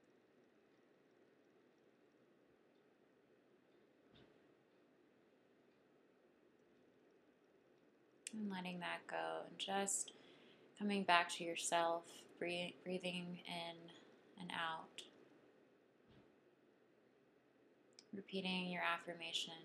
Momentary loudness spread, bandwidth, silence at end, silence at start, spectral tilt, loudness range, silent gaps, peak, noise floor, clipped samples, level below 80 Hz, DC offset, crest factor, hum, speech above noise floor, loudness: 17 LU; 13 kHz; 0 s; 4.15 s; -3 dB/octave; 13 LU; none; -16 dBFS; -74 dBFS; under 0.1%; under -90 dBFS; under 0.1%; 32 dB; none; 30 dB; -43 LUFS